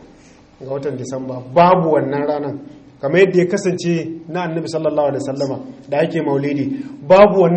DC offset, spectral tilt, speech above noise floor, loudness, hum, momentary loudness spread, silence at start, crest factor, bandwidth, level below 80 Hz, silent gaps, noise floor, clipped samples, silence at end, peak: under 0.1%; -7 dB/octave; 29 dB; -17 LUFS; none; 14 LU; 0.6 s; 16 dB; 8.8 kHz; -52 dBFS; none; -45 dBFS; under 0.1%; 0 s; 0 dBFS